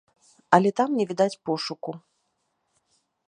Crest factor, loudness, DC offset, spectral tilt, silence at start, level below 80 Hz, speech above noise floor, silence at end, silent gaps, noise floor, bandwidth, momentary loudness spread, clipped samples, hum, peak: 26 dB; -24 LUFS; under 0.1%; -5.5 dB/octave; 0.5 s; -74 dBFS; 51 dB; 1.3 s; none; -75 dBFS; 10.5 kHz; 16 LU; under 0.1%; none; -2 dBFS